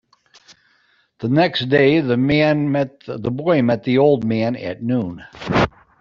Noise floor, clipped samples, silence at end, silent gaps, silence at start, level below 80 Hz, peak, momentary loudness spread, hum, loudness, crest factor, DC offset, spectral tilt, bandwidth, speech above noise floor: -60 dBFS; under 0.1%; 0.3 s; none; 1.2 s; -48 dBFS; -2 dBFS; 10 LU; none; -18 LUFS; 16 dB; under 0.1%; -8 dB/octave; 7.2 kHz; 43 dB